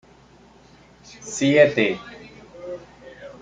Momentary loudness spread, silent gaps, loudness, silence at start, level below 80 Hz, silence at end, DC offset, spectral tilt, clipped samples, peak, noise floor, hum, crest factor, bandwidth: 26 LU; none; -19 LUFS; 1.2 s; -58 dBFS; 0.1 s; under 0.1%; -4.5 dB/octave; under 0.1%; -2 dBFS; -51 dBFS; none; 22 dB; 9.4 kHz